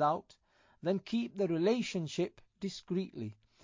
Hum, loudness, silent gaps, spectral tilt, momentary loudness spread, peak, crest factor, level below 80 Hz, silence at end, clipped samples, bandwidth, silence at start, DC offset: none; -36 LUFS; none; -6 dB/octave; 11 LU; -18 dBFS; 18 dB; -74 dBFS; 0.3 s; under 0.1%; 7.6 kHz; 0 s; under 0.1%